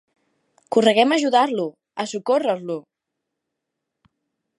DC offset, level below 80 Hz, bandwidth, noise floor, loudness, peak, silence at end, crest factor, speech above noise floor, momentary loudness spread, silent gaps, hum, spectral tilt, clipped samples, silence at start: under 0.1%; -78 dBFS; 11.5 kHz; -81 dBFS; -20 LUFS; -2 dBFS; 1.8 s; 20 dB; 62 dB; 14 LU; none; none; -4 dB/octave; under 0.1%; 0.7 s